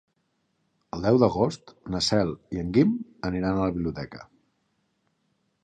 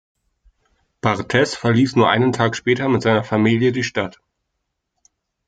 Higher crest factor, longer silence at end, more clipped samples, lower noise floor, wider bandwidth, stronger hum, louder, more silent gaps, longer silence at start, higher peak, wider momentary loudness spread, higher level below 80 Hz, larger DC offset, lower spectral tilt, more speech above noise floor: about the same, 22 dB vs 18 dB; about the same, 1.4 s vs 1.4 s; neither; about the same, -73 dBFS vs -76 dBFS; about the same, 9.8 kHz vs 9.2 kHz; neither; second, -25 LUFS vs -18 LUFS; neither; about the same, 0.95 s vs 1.05 s; second, -6 dBFS vs -2 dBFS; first, 17 LU vs 7 LU; first, -48 dBFS vs -56 dBFS; neither; about the same, -6 dB/octave vs -6 dB/octave; second, 49 dB vs 59 dB